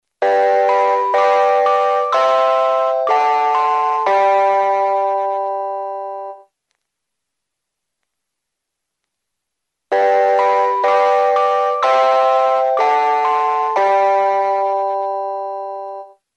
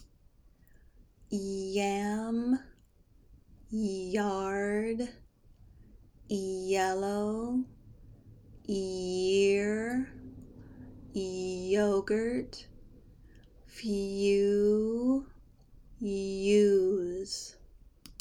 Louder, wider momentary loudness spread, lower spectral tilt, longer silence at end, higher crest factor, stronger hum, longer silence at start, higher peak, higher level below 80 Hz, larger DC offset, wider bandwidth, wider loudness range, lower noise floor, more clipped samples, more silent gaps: first, -15 LUFS vs -31 LUFS; second, 10 LU vs 18 LU; second, -2 dB/octave vs -5.5 dB/octave; first, 0.3 s vs 0.1 s; about the same, 14 dB vs 18 dB; neither; first, 0.2 s vs 0 s; first, -2 dBFS vs -14 dBFS; second, -84 dBFS vs -56 dBFS; neither; second, 8.6 kHz vs 12 kHz; first, 9 LU vs 6 LU; first, -79 dBFS vs -62 dBFS; neither; neither